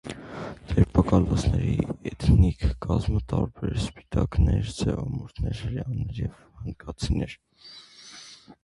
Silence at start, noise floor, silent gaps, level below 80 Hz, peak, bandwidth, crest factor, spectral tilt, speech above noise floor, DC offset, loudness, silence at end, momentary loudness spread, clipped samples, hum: 0.05 s; -47 dBFS; none; -32 dBFS; -4 dBFS; 11.5 kHz; 22 dB; -7.5 dB/octave; 22 dB; under 0.1%; -26 LUFS; 0.1 s; 22 LU; under 0.1%; none